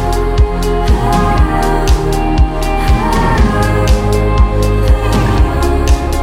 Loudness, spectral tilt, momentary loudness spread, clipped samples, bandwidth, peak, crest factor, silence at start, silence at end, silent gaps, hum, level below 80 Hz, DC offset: -13 LUFS; -6.5 dB/octave; 2 LU; under 0.1%; 15.5 kHz; 0 dBFS; 10 dB; 0 s; 0 s; none; none; -12 dBFS; under 0.1%